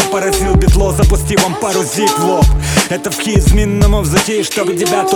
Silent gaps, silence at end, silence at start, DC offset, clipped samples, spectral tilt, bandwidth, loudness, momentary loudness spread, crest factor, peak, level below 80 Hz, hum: none; 0 s; 0 s; under 0.1%; under 0.1%; -4.5 dB/octave; 19.5 kHz; -13 LUFS; 4 LU; 12 dB; 0 dBFS; -16 dBFS; none